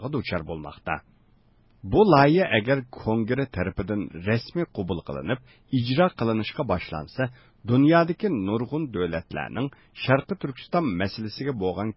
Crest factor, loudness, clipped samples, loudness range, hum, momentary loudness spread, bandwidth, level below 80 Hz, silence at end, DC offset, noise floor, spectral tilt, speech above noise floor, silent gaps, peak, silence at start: 20 dB; -25 LUFS; under 0.1%; 5 LU; none; 13 LU; 5.8 kHz; -48 dBFS; 0.05 s; under 0.1%; -60 dBFS; -11 dB/octave; 35 dB; none; -4 dBFS; 0 s